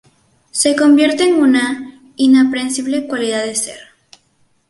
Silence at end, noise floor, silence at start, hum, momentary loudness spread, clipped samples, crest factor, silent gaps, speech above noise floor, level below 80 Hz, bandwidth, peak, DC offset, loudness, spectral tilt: 0.9 s; -58 dBFS; 0.55 s; none; 12 LU; under 0.1%; 14 dB; none; 45 dB; -62 dBFS; 11.5 kHz; 0 dBFS; under 0.1%; -14 LUFS; -2.5 dB/octave